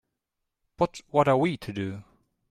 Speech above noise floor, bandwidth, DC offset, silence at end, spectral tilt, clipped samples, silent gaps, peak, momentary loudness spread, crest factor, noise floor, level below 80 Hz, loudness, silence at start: 58 dB; 14.5 kHz; under 0.1%; 0.5 s; -7 dB/octave; under 0.1%; none; -8 dBFS; 13 LU; 22 dB; -83 dBFS; -60 dBFS; -27 LUFS; 0.8 s